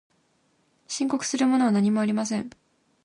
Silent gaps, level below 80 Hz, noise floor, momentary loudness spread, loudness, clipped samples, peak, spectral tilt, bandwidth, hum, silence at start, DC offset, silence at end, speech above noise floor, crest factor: none; -70 dBFS; -67 dBFS; 11 LU; -24 LUFS; under 0.1%; -12 dBFS; -5 dB/octave; 11 kHz; none; 0.9 s; under 0.1%; 0.55 s; 44 dB; 14 dB